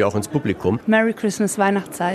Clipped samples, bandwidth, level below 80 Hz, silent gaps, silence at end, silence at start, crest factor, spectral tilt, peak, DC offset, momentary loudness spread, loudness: under 0.1%; 14 kHz; -54 dBFS; none; 0 s; 0 s; 16 dB; -5.5 dB/octave; -4 dBFS; under 0.1%; 5 LU; -20 LUFS